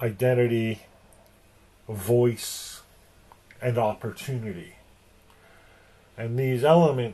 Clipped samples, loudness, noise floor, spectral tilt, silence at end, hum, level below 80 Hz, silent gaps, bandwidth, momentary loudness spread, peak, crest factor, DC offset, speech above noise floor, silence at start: under 0.1%; -25 LUFS; -57 dBFS; -6.5 dB/octave; 0 s; none; -58 dBFS; none; 13 kHz; 18 LU; -6 dBFS; 20 dB; under 0.1%; 33 dB; 0 s